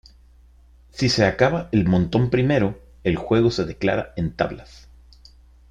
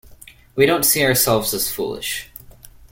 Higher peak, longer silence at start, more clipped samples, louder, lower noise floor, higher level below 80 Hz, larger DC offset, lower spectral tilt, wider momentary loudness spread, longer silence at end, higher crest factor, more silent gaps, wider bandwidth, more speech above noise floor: about the same, -2 dBFS vs -2 dBFS; first, 0.95 s vs 0.1 s; neither; second, -21 LUFS vs -17 LUFS; first, -51 dBFS vs -45 dBFS; about the same, -44 dBFS vs -48 dBFS; neither; first, -6.5 dB/octave vs -3 dB/octave; second, 8 LU vs 14 LU; first, 1.1 s vs 0.05 s; about the same, 20 dB vs 18 dB; neither; second, 10.5 kHz vs 17 kHz; first, 30 dB vs 26 dB